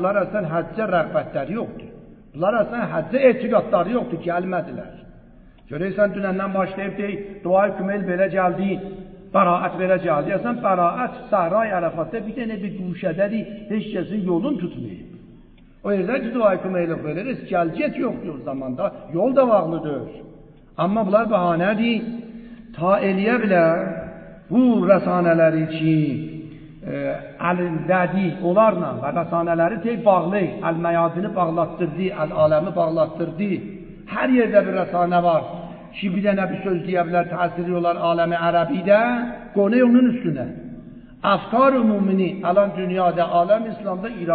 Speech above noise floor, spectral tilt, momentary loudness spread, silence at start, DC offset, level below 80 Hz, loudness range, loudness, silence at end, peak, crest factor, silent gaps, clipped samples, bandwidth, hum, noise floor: 27 dB; -12 dB/octave; 13 LU; 0 s; under 0.1%; -52 dBFS; 5 LU; -21 LUFS; 0 s; -2 dBFS; 18 dB; none; under 0.1%; 4.7 kHz; none; -47 dBFS